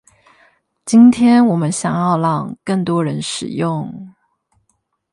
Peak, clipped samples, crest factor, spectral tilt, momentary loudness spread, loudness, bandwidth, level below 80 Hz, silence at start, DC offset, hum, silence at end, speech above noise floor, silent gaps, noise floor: 0 dBFS; under 0.1%; 16 dB; -6 dB/octave; 14 LU; -15 LUFS; 11.5 kHz; -58 dBFS; 0.85 s; under 0.1%; none; 1.05 s; 52 dB; none; -67 dBFS